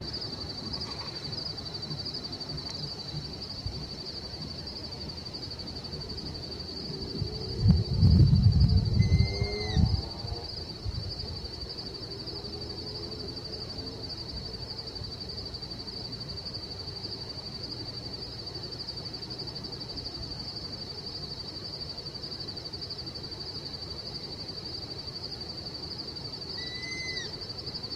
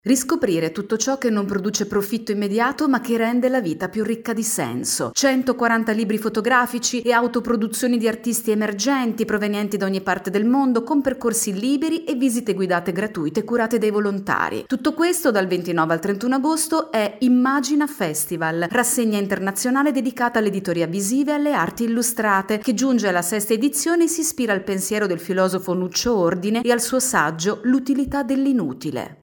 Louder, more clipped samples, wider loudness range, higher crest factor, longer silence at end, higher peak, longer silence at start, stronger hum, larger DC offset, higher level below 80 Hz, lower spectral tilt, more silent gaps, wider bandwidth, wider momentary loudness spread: second, -33 LUFS vs -20 LUFS; neither; first, 11 LU vs 2 LU; first, 24 dB vs 16 dB; about the same, 0 s vs 0.1 s; second, -8 dBFS vs -4 dBFS; about the same, 0 s vs 0.05 s; neither; neither; first, -40 dBFS vs -56 dBFS; first, -6 dB/octave vs -4 dB/octave; neither; second, 11.5 kHz vs 17.5 kHz; first, 12 LU vs 4 LU